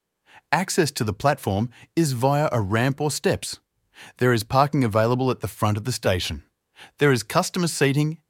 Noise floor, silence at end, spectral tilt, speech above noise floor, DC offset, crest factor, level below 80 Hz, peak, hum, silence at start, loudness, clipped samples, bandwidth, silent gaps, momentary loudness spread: -55 dBFS; 0.15 s; -5 dB/octave; 33 dB; under 0.1%; 20 dB; -52 dBFS; -4 dBFS; none; 0.5 s; -23 LUFS; under 0.1%; 17 kHz; none; 6 LU